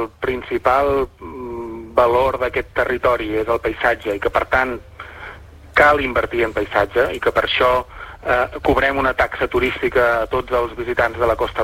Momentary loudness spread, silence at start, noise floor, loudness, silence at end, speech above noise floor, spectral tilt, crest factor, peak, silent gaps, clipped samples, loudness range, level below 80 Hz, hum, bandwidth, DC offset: 13 LU; 0 s; -38 dBFS; -18 LUFS; 0 s; 20 dB; -5.5 dB/octave; 18 dB; -2 dBFS; none; under 0.1%; 2 LU; -36 dBFS; none; 16 kHz; under 0.1%